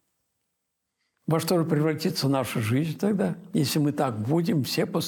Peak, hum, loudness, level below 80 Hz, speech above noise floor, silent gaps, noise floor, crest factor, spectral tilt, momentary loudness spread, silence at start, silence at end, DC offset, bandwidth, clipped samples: -12 dBFS; none; -25 LUFS; -68 dBFS; 56 dB; none; -81 dBFS; 14 dB; -6 dB/octave; 3 LU; 1.3 s; 0 s; under 0.1%; 17 kHz; under 0.1%